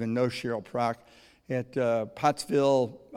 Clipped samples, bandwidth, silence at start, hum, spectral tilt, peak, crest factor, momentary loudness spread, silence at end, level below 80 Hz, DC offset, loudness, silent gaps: under 0.1%; 15.5 kHz; 0 s; none; -6 dB/octave; -10 dBFS; 18 dB; 9 LU; 0 s; -66 dBFS; under 0.1%; -28 LUFS; none